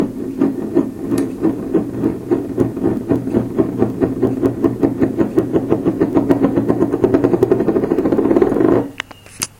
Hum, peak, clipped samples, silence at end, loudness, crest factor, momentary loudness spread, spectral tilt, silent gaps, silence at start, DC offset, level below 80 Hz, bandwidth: none; 0 dBFS; under 0.1%; 0.1 s; -17 LUFS; 16 dB; 6 LU; -7 dB/octave; none; 0 s; under 0.1%; -42 dBFS; 16.5 kHz